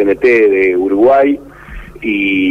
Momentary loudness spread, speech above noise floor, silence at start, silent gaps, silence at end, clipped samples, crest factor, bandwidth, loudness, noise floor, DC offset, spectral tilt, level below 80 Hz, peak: 10 LU; 20 dB; 0 s; none; 0 s; under 0.1%; 10 dB; 6.6 kHz; -11 LUFS; -31 dBFS; under 0.1%; -6.5 dB/octave; -38 dBFS; -2 dBFS